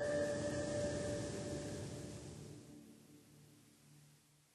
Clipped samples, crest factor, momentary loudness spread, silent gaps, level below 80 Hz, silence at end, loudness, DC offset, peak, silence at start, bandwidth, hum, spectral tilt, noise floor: under 0.1%; 16 dB; 25 LU; none; -64 dBFS; 0.4 s; -43 LUFS; under 0.1%; -28 dBFS; 0 s; 13 kHz; none; -5 dB/octave; -69 dBFS